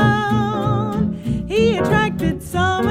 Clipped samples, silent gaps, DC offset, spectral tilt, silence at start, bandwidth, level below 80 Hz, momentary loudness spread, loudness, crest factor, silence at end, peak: under 0.1%; none; under 0.1%; -6.5 dB/octave; 0 s; 16 kHz; -36 dBFS; 5 LU; -19 LUFS; 14 dB; 0 s; -4 dBFS